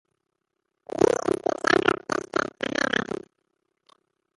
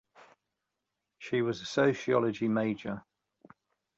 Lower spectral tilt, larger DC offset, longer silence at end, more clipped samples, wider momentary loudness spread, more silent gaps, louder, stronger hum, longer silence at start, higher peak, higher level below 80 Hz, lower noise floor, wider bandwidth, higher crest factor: second, -4 dB/octave vs -6 dB/octave; neither; first, 1.25 s vs 1 s; neither; about the same, 10 LU vs 12 LU; neither; first, -25 LUFS vs -30 LUFS; neither; second, 0.95 s vs 1.2 s; first, -4 dBFS vs -14 dBFS; first, -60 dBFS vs -70 dBFS; second, -80 dBFS vs -86 dBFS; first, 11.5 kHz vs 8 kHz; about the same, 24 dB vs 20 dB